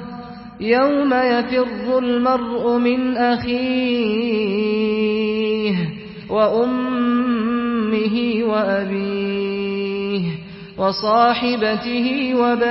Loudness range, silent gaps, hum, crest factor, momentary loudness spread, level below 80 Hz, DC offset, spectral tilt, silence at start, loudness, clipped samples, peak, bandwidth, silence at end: 2 LU; none; none; 16 dB; 6 LU; -52 dBFS; under 0.1%; -10 dB/octave; 0 s; -19 LUFS; under 0.1%; -2 dBFS; 5.8 kHz; 0 s